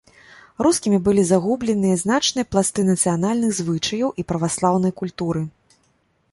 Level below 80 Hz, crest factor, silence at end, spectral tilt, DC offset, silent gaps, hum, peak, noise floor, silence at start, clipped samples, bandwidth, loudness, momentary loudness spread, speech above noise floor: -50 dBFS; 18 dB; 0.85 s; -5 dB/octave; under 0.1%; none; none; -4 dBFS; -64 dBFS; 0.6 s; under 0.1%; 11.5 kHz; -20 LUFS; 7 LU; 44 dB